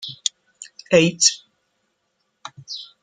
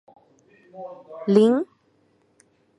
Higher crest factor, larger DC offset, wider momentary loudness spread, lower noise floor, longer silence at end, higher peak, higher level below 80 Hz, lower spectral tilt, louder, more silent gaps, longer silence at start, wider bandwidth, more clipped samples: about the same, 22 dB vs 22 dB; neither; first, 25 LU vs 22 LU; first, -72 dBFS vs -64 dBFS; second, 0.2 s vs 1.15 s; about the same, -2 dBFS vs -4 dBFS; first, -64 dBFS vs -78 dBFS; second, -2.5 dB/octave vs -8 dB/octave; about the same, -18 LUFS vs -20 LUFS; neither; second, 0 s vs 0.75 s; about the same, 11 kHz vs 11 kHz; neither